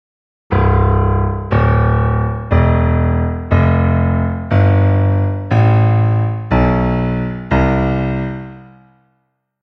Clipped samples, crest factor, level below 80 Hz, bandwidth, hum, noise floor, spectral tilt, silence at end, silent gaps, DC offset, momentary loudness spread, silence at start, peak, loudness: under 0.1%; 14 dB; -24 dBFS; 5.6 kHz; none; -66 dBFS; -10 dB/octave; 1 s; none; under 0.1%; 6 LU; 0.5 s; 0 dBFS; -15 LUFS